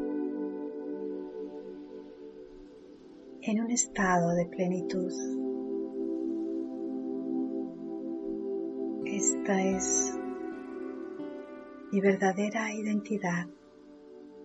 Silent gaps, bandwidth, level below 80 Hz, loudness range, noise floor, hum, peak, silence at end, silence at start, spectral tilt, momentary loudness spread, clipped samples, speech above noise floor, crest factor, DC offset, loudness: none; 8.2 kHz; -64 dBFS; 4 LU; -53 dBFS; none; -12 dBFS; 0 s; 0 s; -4.5 dB/octave; 20 LU; under 0.1%; 24 dB; 22 dB; under 0.1%; -32 LUFS